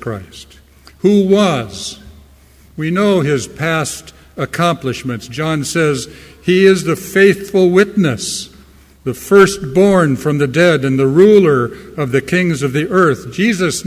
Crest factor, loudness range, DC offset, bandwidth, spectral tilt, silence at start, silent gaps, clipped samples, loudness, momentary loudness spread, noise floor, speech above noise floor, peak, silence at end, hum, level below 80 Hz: 14 dB; 6 LU; under 0.1%; 16 kHz; -5.5 dB/octave; 0 s; none; under 0.1%; -13 LUFS; 14 LU; -44 dBFS; 31 dB; 0 dBFS; 0.05 s; none; -44 dBFS